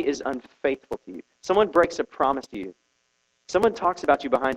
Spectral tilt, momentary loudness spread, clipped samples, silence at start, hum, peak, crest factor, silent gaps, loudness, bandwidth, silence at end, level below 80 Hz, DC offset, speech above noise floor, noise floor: -4.5 dB/octave; 16 LU; under 0.1%; 0 s; none; -6 dBFS; 20 dB; none; -24 LUFS; 12 kHz; 0 s; -56 dBFS; under 0.1%; 46 dB; -71 dBFS